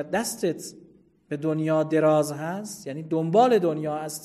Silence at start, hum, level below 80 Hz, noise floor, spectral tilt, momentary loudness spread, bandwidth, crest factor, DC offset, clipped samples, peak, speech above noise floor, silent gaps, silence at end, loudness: 0 s; none; -68 dBFS; -55 dBFS; -5.5 dB/octave; 15 LU; 13 kHz; 18 dB; under 0.1%; under 0.1%; -6 dBFS; 31 dB; none; 0 s; -24 LUFS